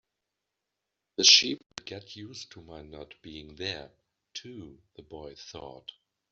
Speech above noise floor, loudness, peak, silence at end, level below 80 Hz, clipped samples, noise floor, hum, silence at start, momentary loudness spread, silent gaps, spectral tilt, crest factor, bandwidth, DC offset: 55 dB; -21 LUFS; -4 dBFS; 0.6 s; -64 dBFS; under 0.1%; -86 dBFS; none; 1.2 s; 28 LU; none; 0 dB/octave; 28 dB; 7.6 kHz; under 0.1%